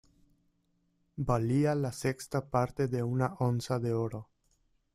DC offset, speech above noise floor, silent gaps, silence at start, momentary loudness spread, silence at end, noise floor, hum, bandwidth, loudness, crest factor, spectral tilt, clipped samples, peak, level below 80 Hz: under 0.1%; 44 dB; none; 1.15 s; 9 LU; 0.7 s; -74 dBFS; none; 14 kHz; -32 LUFS; 18 dB; -7 dB/octave; under 0.1%; -14 dBFS; -56 dBFS